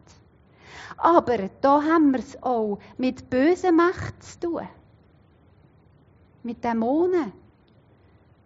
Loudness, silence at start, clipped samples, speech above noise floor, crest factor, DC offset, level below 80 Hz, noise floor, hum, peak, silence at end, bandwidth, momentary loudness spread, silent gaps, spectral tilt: -23 LUFS; 0.7 s; under 0.1%; 35 dB; 20 dB; under 0.1%; -58 dBFS; -57 dBFS; none; -4 dBFS; 1.15 s; 7.6 kHz; 17 LU; none; -5 dB/octave